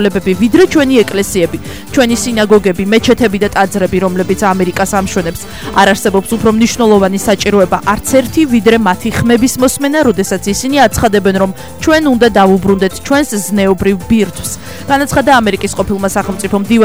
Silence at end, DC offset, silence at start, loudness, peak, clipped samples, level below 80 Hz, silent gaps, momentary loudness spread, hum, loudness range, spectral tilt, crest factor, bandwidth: 0 s; 2%; 0 s; -11 LUFS; 0 dBFS; 0.5%; -32 dBFS; none; 7 LU; none; 2 LU; -4.5 dB/octave; 10 dB; over 20 kHz